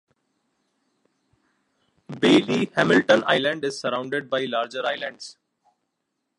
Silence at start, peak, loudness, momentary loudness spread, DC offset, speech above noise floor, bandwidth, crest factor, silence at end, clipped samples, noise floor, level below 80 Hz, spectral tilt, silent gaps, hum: 2.1 s; -2 dBFS; -22 LUFS; 14 LU; under 0.1%; 56 dB; 11.5 kHz; 22 dB; 1.05 s; under 0.1%; -78 dBFS; -70 dBFS; -5 dB/octave; none; none